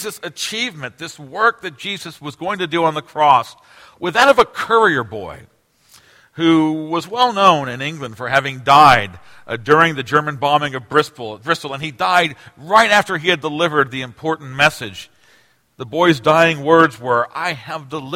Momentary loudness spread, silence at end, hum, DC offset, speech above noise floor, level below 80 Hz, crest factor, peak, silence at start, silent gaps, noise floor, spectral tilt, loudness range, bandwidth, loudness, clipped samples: 16 LU; 0 s; none; under 0.1%; 38 dB; -54 dBFS; 18 dB; 0 dBFS; 0 s; none; -55 dBFS; -4.5 dB/octave; 4 LU; 16.5 kHz; -16 LUFS; under 0.1%